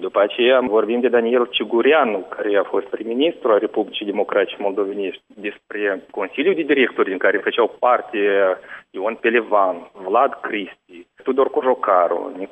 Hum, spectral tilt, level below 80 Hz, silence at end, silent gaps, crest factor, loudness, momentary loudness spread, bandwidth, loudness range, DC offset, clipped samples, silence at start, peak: none; -6.5 dB/octave; -70 dBFS; 0.05 s; none; 16 dB; -19 LUFS; 10 LU; 3.8 kHz; 3 LU; under 0.1%; under 0.1%; 0 s; -4 dBFS